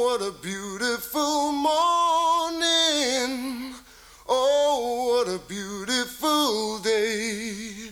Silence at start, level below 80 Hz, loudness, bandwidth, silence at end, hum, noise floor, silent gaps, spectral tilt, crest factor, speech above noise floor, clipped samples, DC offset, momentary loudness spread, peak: 0 s; -58 dBFS; -24 LUFS; over 20 kHz; 0 s; 60 Hz at -65 dBFS; -49 dBFS; none; -2 dB/octave; 16 dB; 22 dB; under 0.1%; under 0.1%; 12 LU; -10 dBFS